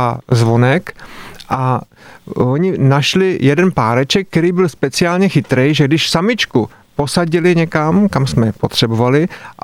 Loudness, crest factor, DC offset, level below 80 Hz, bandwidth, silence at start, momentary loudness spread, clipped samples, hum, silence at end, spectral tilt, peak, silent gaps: -14 LUFS; 12 dB; under 0.1%; -44 dBFS; 14.5 kHz; 0 s; 9 LU; under 0.1%; none; 0.1 s; -6 dB/octave; -2 dBFS; none